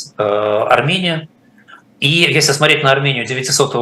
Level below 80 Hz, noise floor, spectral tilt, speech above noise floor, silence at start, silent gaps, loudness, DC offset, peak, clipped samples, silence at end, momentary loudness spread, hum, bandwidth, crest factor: -58 dBFS; -44 dBFS; -3.5 dB/octave; 30 dB; 0 s; none; -13 LUFS; under 0.1%; 0 dBFS; under 0.1%; 0 s; 7 LU; none; 14 kHz; 14 dB